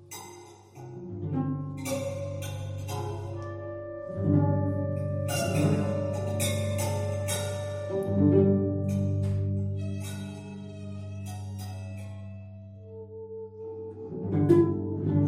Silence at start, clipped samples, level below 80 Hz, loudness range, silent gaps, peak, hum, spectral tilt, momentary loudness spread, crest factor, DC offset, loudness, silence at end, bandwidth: 0 s; under 0.1%; -58 dBFS; 12 LU; none; -8 dBFS; none; -6.5 dB/octave; 19 LU; 20 dB; under 0.1%; -29 LUFS; 0 s; 16 kHz